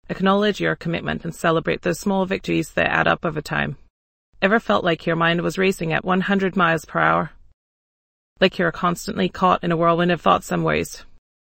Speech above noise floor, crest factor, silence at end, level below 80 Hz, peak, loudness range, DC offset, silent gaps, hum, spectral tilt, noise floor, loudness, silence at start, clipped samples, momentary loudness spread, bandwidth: over 70 dB; 20 dB; 0.45 s; -48 dBFS; 0 dBFS; 2 LU; under 0.1%; 3.90-4.33 s, 7.54-8.36 s; none; -5.5 dB/octave; under -90 dBFS; -20 LUFS; 0.1 s; under 0.1%; 6 LU; 16.5 kHz